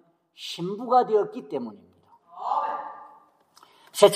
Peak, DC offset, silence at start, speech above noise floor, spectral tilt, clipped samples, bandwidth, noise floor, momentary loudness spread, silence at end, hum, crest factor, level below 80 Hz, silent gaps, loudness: -2 dBFS; under 0.1%; 0.4 s; 32 dB; -4 dB/octave; under 0.1%; 15.5 kHz; -58 dBFS; 19 LU; 0 s; none; 24 dB; -82 dBFS; none; -26 LUFS